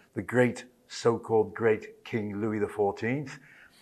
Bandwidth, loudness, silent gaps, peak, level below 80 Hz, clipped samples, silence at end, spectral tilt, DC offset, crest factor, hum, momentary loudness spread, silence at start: 12.5 kHz; -29 LUFS; none; -10 dBFS; -68 dBFS; under 0.1%; 0.45 s; -6.5 dB/octave; under 0.1%; 18 dB; none; 14 LU; 0.15 s